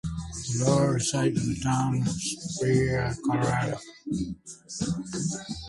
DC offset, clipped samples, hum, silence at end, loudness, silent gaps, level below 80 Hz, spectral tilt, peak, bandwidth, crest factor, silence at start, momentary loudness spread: under 0.1%; under 0.1%; none; 0 s; -27 LUFS; none; -48 dBFS; -5 dB/octave; -10 dBFS; 11.5 kHz; 18 dB; 0.05 s; 11 LU